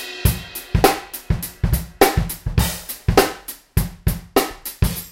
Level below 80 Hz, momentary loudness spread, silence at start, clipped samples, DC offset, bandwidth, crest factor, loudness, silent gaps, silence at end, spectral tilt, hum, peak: -28 dBFS; 8 LU; 0 s; under 0.1%; under 0.1%; 17 kHz; 20 dB; -21 LUFS; none; 0 s; -5 dB/octave; none; 0 dBFS